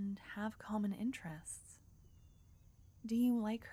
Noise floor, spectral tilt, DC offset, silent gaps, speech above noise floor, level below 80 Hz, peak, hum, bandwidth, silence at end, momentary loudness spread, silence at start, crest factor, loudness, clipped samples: -64 dBFS; -5.5 dB/octave; under 0.1%; none; 25 dB; -68 dBFS; -26 dBFS; none; 15 kHz; 0 s; 18 LU; 0 s; 14 dB; -40 LUFS; under 0.1%